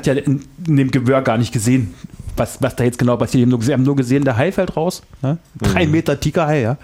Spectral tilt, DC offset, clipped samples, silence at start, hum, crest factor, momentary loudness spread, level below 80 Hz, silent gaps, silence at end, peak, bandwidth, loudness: -6.5 dB/octave; under 0.1%; under 0.1%; 0 s; none; 14 dB; 8 LU; -38 dBFS; none; 0.05 s; -4 dBFS; 16 kHz; -17 LUFS